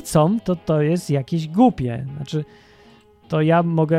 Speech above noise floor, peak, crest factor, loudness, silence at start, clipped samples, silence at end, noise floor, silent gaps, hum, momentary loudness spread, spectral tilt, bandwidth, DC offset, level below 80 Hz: 31 dB; -2 dBFS; 18 dB; -20 LUFS; 0 s; under 0.1%; 0 s; -50 dBFS; none; none; 10 LU; -7.5 dB/octave; 14.5 kHz; under 0.1%; -50 dBFS